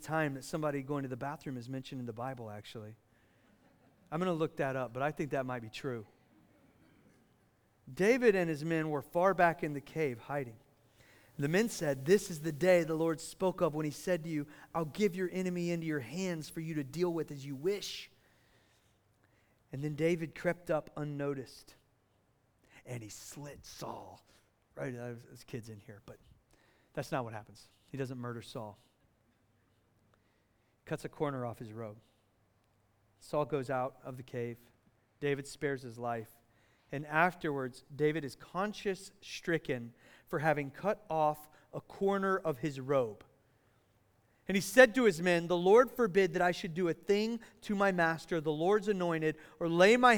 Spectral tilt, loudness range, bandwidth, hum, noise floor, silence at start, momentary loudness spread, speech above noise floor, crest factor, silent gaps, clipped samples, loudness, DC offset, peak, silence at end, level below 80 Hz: -5.5 dB/octave; 15 LU; over 20 kHz; none; -73 dBFS; 0 s; 18 LU; 39 dB; 26 dB; none; under 0.1%; -34 LUFS; under 0.1%; -8 dBFS; 0 s; -68 dBFS